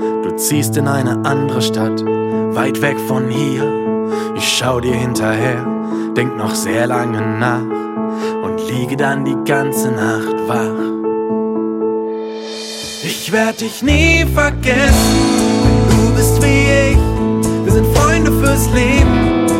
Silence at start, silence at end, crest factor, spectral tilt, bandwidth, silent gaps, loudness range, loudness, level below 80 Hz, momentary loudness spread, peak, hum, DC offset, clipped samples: 0 s; 0 s; 14 dB; -5 dB/octave; 16.5 kHz; none; 6 LU; -15 LUFS; -24 dBFS; 8 LU; 0 dBFS; none; under 0.1%; under 0.1%